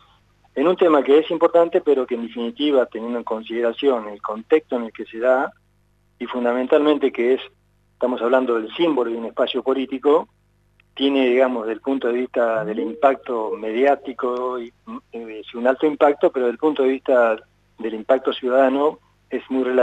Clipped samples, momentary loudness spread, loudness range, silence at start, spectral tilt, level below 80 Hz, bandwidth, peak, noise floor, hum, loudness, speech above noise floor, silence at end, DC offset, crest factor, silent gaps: under 0.1%; 13 LU; 3 LU; 0.55 s; -6.5 dB/octave; -64 dBFS; 8.2 kHz; -2 dBFS; -61 dBFS; 50 Hz at -60 dBFS; -20 LUFS; 41 dB; 0 s; under 0.1%; 18 dB; none